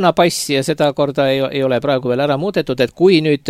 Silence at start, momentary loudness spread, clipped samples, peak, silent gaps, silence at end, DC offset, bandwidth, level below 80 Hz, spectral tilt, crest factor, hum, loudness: 0 s; 5 LU; under 0.1%; 0 dBFS; none; 0 s; under 0.1%; 16 kHz; -52 dBFS; -5 dB/octave; 14 dB; none; -16 LUFS